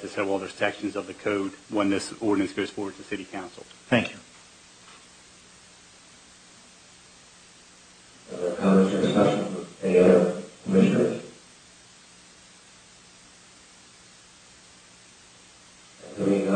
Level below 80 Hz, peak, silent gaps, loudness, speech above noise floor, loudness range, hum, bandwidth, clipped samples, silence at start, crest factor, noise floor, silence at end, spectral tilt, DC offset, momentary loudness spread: -66 dBFS; -6 dBFS; none; -25 LUFS; 24 dB; 11 LU; none; 9.6 kHz; under 0.1%; 0 s; 22 dB; -52 dBFS; 0 s; -6 dB/octave; under 0.1%; 22 LU